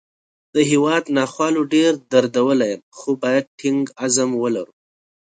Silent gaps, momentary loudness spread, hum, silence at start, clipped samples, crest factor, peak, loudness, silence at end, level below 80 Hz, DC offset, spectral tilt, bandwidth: 2.83-2.92 s, 3.47-3.58 s; 8 LU; none; 0.55 s; under 0.1%; 18 dB; 0 dBFS; -19 LUFS; 0.6 s; -66 dBFS; under 0.1%; -4 dB/octave; 9.4 kHz